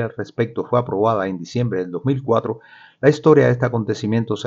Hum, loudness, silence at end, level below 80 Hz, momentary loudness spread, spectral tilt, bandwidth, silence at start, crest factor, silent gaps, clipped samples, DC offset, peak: none; -19 LUFS; 0 s; -56 dBFS; 10 LU; -7.5 dB/octave; 7.6 kHz; 0 s; 18 dB; none; under 0.1%; under 0.1%; 0 dBFS